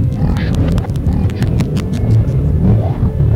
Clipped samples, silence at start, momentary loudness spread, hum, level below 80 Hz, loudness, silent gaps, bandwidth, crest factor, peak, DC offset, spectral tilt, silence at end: under 0.1%; 0 s; 4 LU; none; -20 dBFS; -15 LUFS; none; 10 kHz; 8 dB; -4 dBFS; under 0.1%; -8.5 dB/octave; 0 s